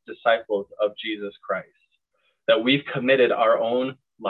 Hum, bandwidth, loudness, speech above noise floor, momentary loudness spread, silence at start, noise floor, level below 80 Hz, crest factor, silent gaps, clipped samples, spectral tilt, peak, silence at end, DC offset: none; 4.5 kHz; -23 LUFS; 49 dB; 11 LU; 0.1 s; -71 dBFS; -72 dBFS; 20 dB; none; under 0.1%; -7.5 dB/octave; -4 dBFS; 0 s; under 0.1%